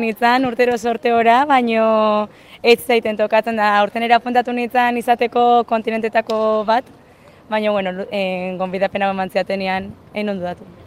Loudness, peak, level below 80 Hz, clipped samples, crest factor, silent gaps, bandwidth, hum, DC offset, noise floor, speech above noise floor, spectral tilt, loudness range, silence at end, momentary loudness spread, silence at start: -17 LUFS; 0 dBFS; -58 dBFS; under 0.1%; 18 dB; none; 16 kHz; none; under 0.1%; -46 dBFS; 29 dB; -5 dB/octave; 5 LU; 0.15 s; 9 LU; 0 s